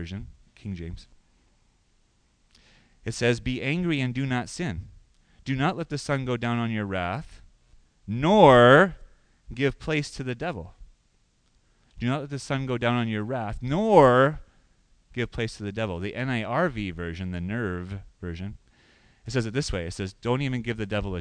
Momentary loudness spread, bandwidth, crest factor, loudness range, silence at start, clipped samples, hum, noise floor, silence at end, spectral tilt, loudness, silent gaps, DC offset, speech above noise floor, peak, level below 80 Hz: 20 LU; 10.5 kHz; 24 dB; 11 LU; 0 s; under 0.1%; none; -66 dBFS; 0 s; -6 dB/octave; -25 LUFS; none; under 0.1%; 41 dB; -2 dBFS; -46 dBFS